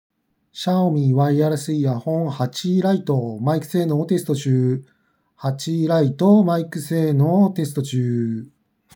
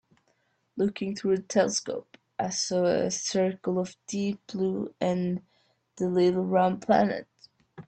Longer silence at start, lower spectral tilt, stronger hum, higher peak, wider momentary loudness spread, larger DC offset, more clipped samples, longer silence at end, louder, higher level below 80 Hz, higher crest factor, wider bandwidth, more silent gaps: second, 0.55 s vs 0.75 s; first, -7.5 dB/octave vs -5 dB/octave; neither; first, -4 dBFS vs -8 dBFS; about the same, 8 LU vs 10 LU; neither; neither; first, 0.5 s vs 0.05 s; first, -20 LUFS vs -28 LUFS; second, -76 dBFS vs -68 dBFS; about the same, 16 dB vs 20 dB; first, 19 kHz vs 9 kHz; neither